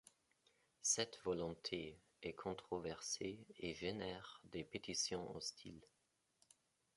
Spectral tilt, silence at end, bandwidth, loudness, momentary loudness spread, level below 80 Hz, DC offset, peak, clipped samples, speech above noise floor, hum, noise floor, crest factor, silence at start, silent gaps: -2.5 dB/octave; 1.1 s; 11.5 kHz; -45 LUFS; 13 LU; -72 dBFS; under 0.1%; -24 dBFS; under 0.1%; 37 dB; none; -84 dBFS; 24 dB; 0.85 s; none